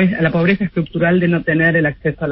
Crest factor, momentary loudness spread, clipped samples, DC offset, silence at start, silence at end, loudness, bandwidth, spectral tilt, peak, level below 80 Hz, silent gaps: 14 dB; 5 LU; under 0.1%; under 0.1%; 0 s; 0 s; -16 LUFS; 5.6 kHz; -12.5 dB/octave; -2 dBFS; -44 dBFS; none